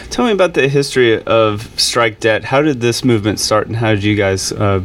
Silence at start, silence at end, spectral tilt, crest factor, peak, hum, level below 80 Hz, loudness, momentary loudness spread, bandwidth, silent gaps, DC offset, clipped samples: 0 s; 0 s; -4.5 dB/octave; 12 dB; 0 dBFS; none; -42 dBFS; -14 LUFS; 3 LU; 16.5 kHz; none; under 0.1%; under 0.1%